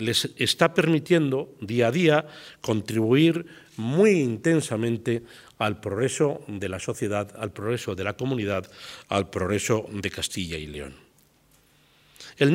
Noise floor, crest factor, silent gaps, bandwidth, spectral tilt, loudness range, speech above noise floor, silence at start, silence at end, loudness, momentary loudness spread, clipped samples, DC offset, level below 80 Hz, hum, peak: -61 dBFS; 22 dB; none; 16 kHz; -5 dB/octave; 7 LU; 36 dB; 0 s; 0 s; -25 LUFS; 13 LU; under 0.1%; under 0.1%; -60 dBFS; none; -4 dBFS